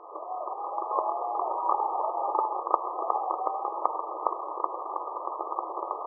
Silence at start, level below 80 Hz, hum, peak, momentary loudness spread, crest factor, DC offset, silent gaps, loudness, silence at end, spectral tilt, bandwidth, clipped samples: 0 s; under -90 dBFS; none; -4 dBFS; 7 LU; 28 dB; under 0.1%; none; -31 LUFS; 0 s; 19.5 dB/octave; 1.4 kHz; under 0.1%